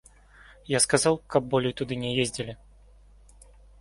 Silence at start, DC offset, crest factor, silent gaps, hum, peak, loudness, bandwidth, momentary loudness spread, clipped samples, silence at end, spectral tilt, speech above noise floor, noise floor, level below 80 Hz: 0.65 s; under 0.1%; 24 dB; none; 50 Hz at -55 dBFS; -6 dBFS; -26 LUFS; 12 kHz; 14 LU; under 0.1%; 1.25 s; -3.5 dB/octave; 28 dB; -54 dBFS; -54 dBFS